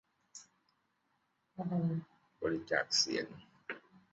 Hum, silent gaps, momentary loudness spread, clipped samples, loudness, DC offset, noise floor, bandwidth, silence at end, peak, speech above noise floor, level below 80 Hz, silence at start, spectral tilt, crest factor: none; none; 23 LU; under 0.1%; -35 LUFS; under 0.1%; -79 dBFS; 7.6 kHz; 0.35 s; -16 dBFS; 44 dB; -74 dBFS; 0.35 s; -3.5 dB/octave; 24 dB